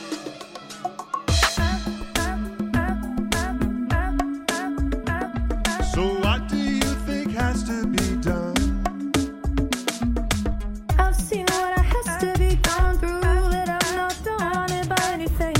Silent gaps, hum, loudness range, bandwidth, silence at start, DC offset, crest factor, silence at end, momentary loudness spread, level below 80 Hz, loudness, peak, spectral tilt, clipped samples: none; none; 3 LU; 16.5 kHz; 0 s; under 0.1%; 18 dB; 0 s; 6 LU; -26 dBFS; -24 LUFS; -4 dBFS; -4.5 dB/octave; under 0.1%